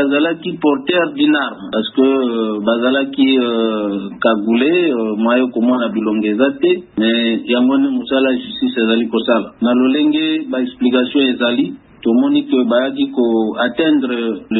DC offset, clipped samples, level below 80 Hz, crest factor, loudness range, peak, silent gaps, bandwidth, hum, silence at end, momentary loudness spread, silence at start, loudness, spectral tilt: under 0.1%; under 0.1%; -58 dBFS; 14 dB; 1 LU; 0 dBFS; none; 4.1 kHz; none; 0 s; 5 LU; 0 s; -15 LUFS; -10 dB/octave